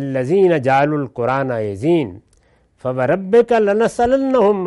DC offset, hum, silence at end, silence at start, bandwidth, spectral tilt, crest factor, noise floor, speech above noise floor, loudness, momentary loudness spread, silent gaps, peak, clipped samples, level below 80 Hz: under 0.1%; none; 0 s; 0 s; 11.5 kHz; -7.5 dB/octave; 12 dB; -56 dBFS; 40 dB; -16 LUFS; 7 LU; none; -4 dBFS; under 0.1%; -50 dBFS